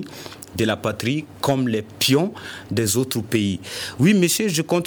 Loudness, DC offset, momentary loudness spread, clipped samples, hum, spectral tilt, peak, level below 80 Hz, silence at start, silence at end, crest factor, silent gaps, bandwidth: -21 LUFS; under 0.1%; 11 LU; under 0.1%; none; -4.5 dB/octave; -6 dBFS; -56 dBFS; 0 s; 0 s; 14 dB; none; over 20 kHz